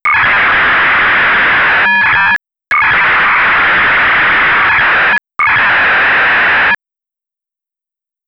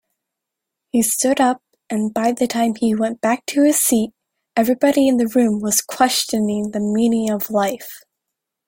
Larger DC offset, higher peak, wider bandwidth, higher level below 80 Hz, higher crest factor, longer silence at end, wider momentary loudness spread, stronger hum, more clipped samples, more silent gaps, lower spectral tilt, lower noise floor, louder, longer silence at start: neither; second, -6 dBFS vs -2 dBFS; second, 6.8 kHz vs 17 kHz; first, -40 dBFS vs -60 dBFS; second, 4 dB vs 16 dB; first, 1.55 s vs 0.7 s; second, 3 LU vs 8 LU; neither; neither; neither; about the same, -4.5 dB/octave vs -3.5 dB/octave; first, -87 dBFS vs -82 dBFS; first, -8 LUFS vs -18 LUFS; second, 0.05 s vs 0.95 s